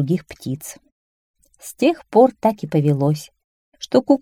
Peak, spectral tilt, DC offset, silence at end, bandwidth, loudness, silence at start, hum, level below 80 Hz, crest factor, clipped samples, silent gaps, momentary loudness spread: -2 dBFS; -7 dB/octave; under 0.1%; 0.05 s; 16.5 kHz; -19 LUFS; 0 s; none; -58 dBFS; 18 dB; under 0.1%; 0.92-1.34 s, 3.44-3.72 s; 20 LU